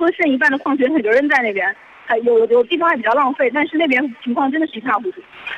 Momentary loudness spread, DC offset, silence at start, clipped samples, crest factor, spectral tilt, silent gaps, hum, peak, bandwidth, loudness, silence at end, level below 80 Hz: 7 LU; under 0.1%; 0 s; under 0.1%; 12 dB; -5 dB/octave; none; none; -4 dBFS; 8.6 kHz; -16 LUFS; 0 s; -64 dBFS